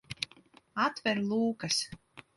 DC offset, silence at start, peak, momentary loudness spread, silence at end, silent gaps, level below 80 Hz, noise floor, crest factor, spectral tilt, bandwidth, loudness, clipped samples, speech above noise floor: under 0.1%; 0.1 s; -12 dBFS; 12 LU; 0.15 s; none; -68 dBFS; -60 dBFS; 22 dB; -3.5 dB/octave; 11.5 kHz; -32 LUFS; under 0.1%; 29 dB